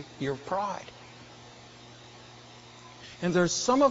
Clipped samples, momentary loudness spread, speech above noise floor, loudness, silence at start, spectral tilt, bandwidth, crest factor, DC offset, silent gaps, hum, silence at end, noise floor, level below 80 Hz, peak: under 0.1%; 24 LU; 23 dB; -29 LUFS; 0 s; -4.5 dB/octave; 8 kHz; 20 dB; under 0.1%; none; none; 0 s; -50 dBFS; -62 dBFS; -10 dBFS